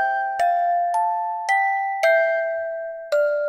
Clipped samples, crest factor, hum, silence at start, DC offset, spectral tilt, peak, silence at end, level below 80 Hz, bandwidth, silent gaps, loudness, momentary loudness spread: under 0.1%; 12 dB; none; 0 s; under 0.1%; 0.5 dB/octave; -8 dBFS; 0 s; -72 dBFS; 16 kHz; none; -21 LUFS; 7 LU